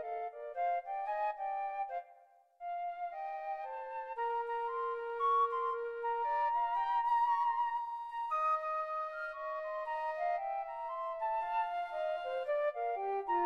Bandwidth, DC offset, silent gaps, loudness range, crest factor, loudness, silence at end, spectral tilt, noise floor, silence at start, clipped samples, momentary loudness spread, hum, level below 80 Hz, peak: 6.6 kHz; under 0.1%; none; 7 LU; 12 dB; -36 LUFS; 0 s; -3.5 dB/octave; -63 dBFS; 0 s; under 0.1%; 10 LU; none; -76 dBFS; -24 dBFS